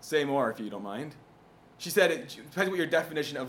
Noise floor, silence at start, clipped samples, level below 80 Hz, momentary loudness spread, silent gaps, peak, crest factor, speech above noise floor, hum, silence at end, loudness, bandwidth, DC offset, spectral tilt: -57 dBFS; 0 s; under 0.1%; -72 dBFS; 14 LU; none; -8 dBFS; 22 dB; 27 dB; none; 0 s; -30 LUFS; 18 kHz; under 0.1%; -4 dB/octave